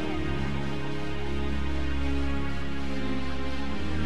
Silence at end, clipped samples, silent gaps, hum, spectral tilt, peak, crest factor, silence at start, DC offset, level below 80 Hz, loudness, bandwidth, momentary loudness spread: 0 s; under 0.1%; none; none; -6.5 dB/octave; -16 dBFS; 12 dB; 0 s; 5%; -36 dBFS; -32 LUFS; 11 kHz; 3 LU